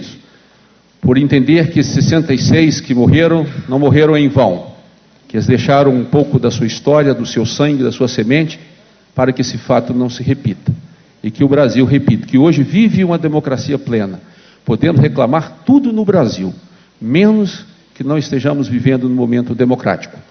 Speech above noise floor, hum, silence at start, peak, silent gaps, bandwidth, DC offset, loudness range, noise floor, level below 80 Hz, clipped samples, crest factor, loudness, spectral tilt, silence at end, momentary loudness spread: 37 dB; none; 0 s; 0 dBFS; none; 6.6 kHz; under 0.1%; 4 LU; -49 dBFS; -42 dBFS; under 0.1%; 12 dB; -13 LUFS; -7 dB/octave; 0.25 s; 11 LU